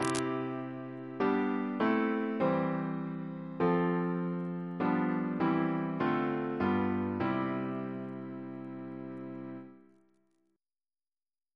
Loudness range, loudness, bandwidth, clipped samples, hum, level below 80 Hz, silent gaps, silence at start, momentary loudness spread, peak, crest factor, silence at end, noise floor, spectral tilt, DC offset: 11 LU; -33 LUFS; 11 kHz; under 0.1%; none; -70 dBFS; none; 0 s; 13 LU; -12 dBFS; 22 dB; 1.75 s; under -90 dBFS; -7 dB/octave; under 0.1%